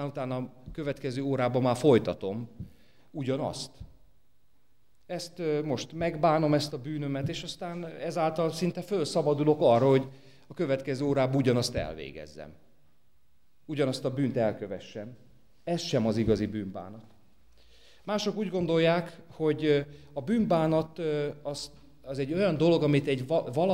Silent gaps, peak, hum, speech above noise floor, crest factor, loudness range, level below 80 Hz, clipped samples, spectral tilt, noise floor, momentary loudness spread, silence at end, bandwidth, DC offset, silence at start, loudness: none; -10 dBFS; none; 43 dB; 20 dB; 7 LU; -56 dBFS; under 0.1%; -6.5 dB/octave; -71 dBFS; 18 LU; 0 s; 16 kHz; 0.2%; 0 s; -29 LUFS